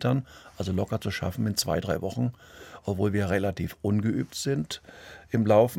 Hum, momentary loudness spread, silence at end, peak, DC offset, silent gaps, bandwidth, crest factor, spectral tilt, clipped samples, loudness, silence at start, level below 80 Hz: none; 12 LU; 0 s; -8 dBFS; under 0.1%; none; 17 kHz; 20 dB; -6 dB/octave; under 0.1%; -28 LUFS; 0 s; -56 dBFS